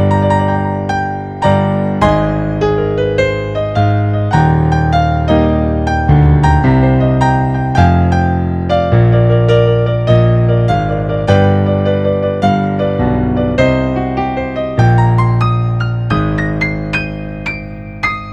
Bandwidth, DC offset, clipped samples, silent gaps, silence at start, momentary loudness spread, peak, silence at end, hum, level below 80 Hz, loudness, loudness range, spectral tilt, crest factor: 8.4 kHz; under 0.1%; under 0.1%; none; 0 s; 7 LU; 0 dBFS; 0 s; none; -24 dBFS; -13 LUFS; 3 LU; -8.5 dB/octave; 12 dB